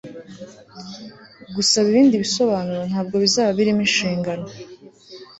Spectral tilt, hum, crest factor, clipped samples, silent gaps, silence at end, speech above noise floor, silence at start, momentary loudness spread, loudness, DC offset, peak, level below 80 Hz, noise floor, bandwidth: -4 dB/octave; none; 18 dB; under 0.1%; none; 0.15 s; 23 dB; 0.05 s; 23 LU; -18 LUFS; under 0.1%; -4 dBFS; -58 dBFS; -43 dBFS; 8.2 kHz